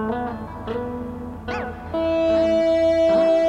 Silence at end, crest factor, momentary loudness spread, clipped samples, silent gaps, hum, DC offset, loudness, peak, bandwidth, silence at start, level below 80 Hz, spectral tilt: 0 s; 12 dB; 14 LU; under 0.1%; none; none; under 0.1%; -21 LUFS; -8 dBFS; 8.6 kHz; 0 s; -42 dBFS; -6.5 dB/octave